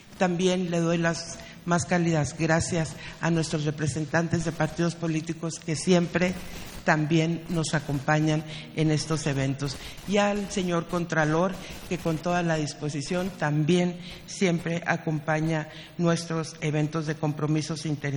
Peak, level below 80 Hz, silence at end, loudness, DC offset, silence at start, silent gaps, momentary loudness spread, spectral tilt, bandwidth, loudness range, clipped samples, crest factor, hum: -6 dBFS; -50 dBFS; 0 s; -27 LUFS; under 0.1%; 0.05 s; none; 8 LU; -5.5 dB/octave; 17 kHz; 2 LU; under 0.1%; 22 dB; none